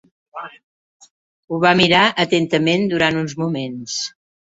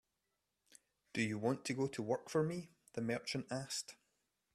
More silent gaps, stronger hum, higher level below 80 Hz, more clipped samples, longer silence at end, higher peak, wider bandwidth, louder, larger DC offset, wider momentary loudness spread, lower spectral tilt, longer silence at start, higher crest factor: first, 0.63-1.00 s, 1.10-1.43 s vs none; neither; first, -56 dBFS vs -78 dBFS; neither; about the same, 0.5 s vs 0.6 s; first, 0 dBFS vs -24 dBFS; second, 8 kHz vs 14.5 kHz; first, -17 LUFS vs -40 LUFS; neither; first, 21 LU vs 8 LU; about the same, -4.5 dB/octave vs -5 dB/octave; second, 0.35 s vs 1.15 s; about the same, 18 dB vs 18 dB